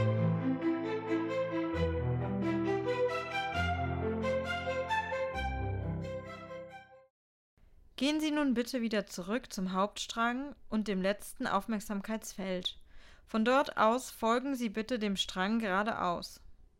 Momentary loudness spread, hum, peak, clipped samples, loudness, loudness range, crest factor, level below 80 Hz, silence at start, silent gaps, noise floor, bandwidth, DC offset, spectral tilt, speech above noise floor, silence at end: 8 LU; none; -16 dBFS; under 0.1%; -34 LUFS; 5 LU; 18 dB; -54 dBFS; 0 s; 7.10-7.57 s; -53 dBFS; 16 kHz; under 0.1%; -5.5 dB/octave; 20 dB; 0.15 s